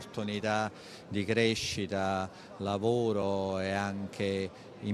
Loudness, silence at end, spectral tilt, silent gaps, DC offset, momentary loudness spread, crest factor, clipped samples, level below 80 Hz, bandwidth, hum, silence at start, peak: -32 LUFS; 0 s; -5 dB/octave; none; under 0.1%; 10 LU; 20 dB; under 0.1%; -66 dBFS; 13 kHz; none; 0 s; -14 dBFS